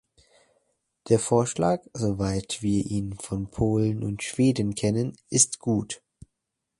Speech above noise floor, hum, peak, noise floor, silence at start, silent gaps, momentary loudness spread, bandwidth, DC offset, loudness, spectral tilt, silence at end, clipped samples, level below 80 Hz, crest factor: 57 dB; none; -4 dBFS; -82 dBFS; 1.05 s; none; 10 LU; 11.5 kHz; under 0.1%; -25 LUFS; -5 dB/octave; 0.85 s; under 0.1%; -48 dBFS; 22 dB